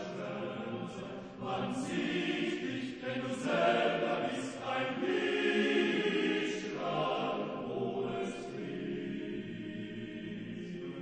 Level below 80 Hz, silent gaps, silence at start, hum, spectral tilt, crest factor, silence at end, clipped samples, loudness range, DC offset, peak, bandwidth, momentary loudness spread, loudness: -68 dBFS; none; 0 s; none; -5 dB/octave; 16 dB; 0 s; under 0.1%; 7 LU; under 0.1%; -18 dBFS; 10 kHz; 12 LU; -35 LUFS